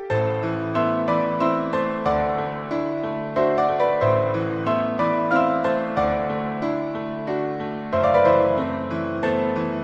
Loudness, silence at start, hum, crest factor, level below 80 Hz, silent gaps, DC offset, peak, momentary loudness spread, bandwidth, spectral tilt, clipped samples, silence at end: -22 LUFS; 0 s; none; 16 dB; -50 dBFS; none; under 0.1%; -6 dBFS; 7 LU; 7.8 kHz; -8 dB/octave; under 0.1%; 0 s